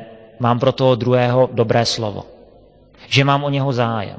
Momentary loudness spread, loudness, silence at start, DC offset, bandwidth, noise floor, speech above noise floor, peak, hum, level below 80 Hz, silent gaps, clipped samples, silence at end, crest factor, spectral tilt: 7 LU; -17 LUFS; 0 s; under 0.1%; 8 kHz; -48 dBFS; 31 dB; 0 dBFS; none; -50 dBFS; none; under 0.1%; 0 s; 18 dB; -6 dB/octave